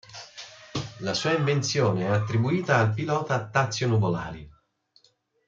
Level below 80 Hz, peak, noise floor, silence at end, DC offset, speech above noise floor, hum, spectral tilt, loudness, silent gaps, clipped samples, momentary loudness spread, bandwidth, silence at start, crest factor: -58 dBFS; -6 dBFS; -65 dBFS; 1 s; under 0.1%; 41 dB; none; -5.5 dB/octave; -25 LUFS; none; under 0.1%; 17 LU; 7.6 kHz; 0.1 s; 20 dB